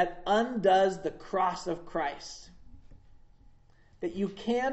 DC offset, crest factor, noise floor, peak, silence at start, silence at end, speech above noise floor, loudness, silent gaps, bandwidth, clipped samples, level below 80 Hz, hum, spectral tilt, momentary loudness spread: under 0.1%; 18 dB; -59 dBFS; -12 dBFS; 0 s; 0 s; 29 dB; -30 LUFS; none; 8.2 kHz; under 0.1%; -56 dBFS; none; -5 dB/octave; 14 LU